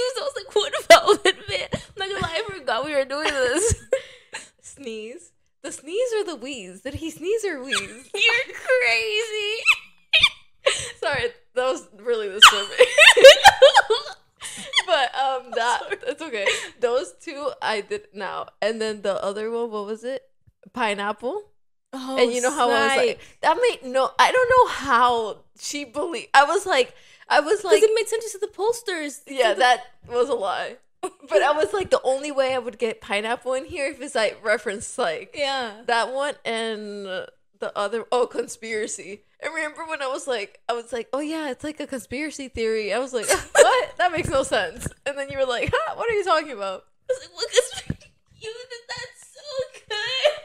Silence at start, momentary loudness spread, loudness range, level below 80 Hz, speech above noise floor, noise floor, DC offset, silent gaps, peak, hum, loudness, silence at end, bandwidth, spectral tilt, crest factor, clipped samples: 0 s; 17 LU; 14 LU; -52 dBFS; 19 dB; -42 dBFS; under 0.1%; none; 0 dBFS; none; -21 LUFS; 0 s; 16 kHz; -2 dB/octave; 22 dB; under 0.1%